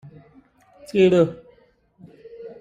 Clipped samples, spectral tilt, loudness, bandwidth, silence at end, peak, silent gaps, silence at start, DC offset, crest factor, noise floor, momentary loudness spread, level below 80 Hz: under 0.1%; -7.5 dB/octave; -19 LUFS; 10.5 kHz; 0.1 s; -6 dBFS; none; 0.95 s; under 0.1%; 18 dB; -58 dBFS; 25 LU; -62 dBFS